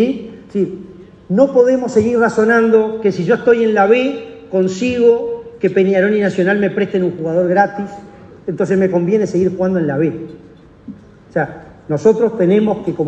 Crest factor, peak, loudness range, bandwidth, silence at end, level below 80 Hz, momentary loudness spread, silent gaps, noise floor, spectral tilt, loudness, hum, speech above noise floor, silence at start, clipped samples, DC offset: 14 dB; 0 dBFS; 5 LU; 8.4 kHz; 0 s; -52 dBFS; 12 LU; none; -36 dBFS; -7 dB/octave; -15 LUFS; none; 22 dB; 0 s; under 0.1%; under 0.1%